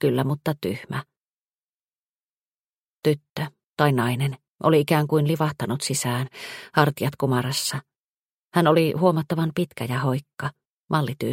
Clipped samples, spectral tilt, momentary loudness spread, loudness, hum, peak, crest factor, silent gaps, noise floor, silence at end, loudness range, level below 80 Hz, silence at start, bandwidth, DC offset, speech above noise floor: under 0.1%; -5.5 dB/octave; 13 LU; -24 LUFS; none; -2 dBFS; 22 dB; 1.17-2.19 s, 2.25-3.03 s, 3.30-3.36 s, 3.66-3.74 s, 4.50-4.55 s, 7.96-8.51 s, 10.70-10.87 s; under -90 dBFS; 0 s; 7 LU; -62 dBFS; 0 s; 16.5 kHz; under 0.1%; over 67 dB